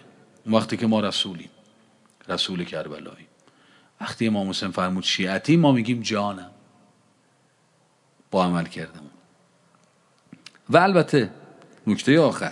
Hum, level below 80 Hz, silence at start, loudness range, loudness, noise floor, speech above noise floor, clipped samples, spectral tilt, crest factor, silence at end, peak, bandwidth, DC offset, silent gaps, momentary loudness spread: none; -72 dBFS; 0.45 s; 8 LU; -22 LUFS; -63 dBFS; 40 dB; under 0.1%; -5.5 dB/octave; 22 dB; 0 s; -2 dBFS; 11.5 kHz; under 0.1%; none; 18 LU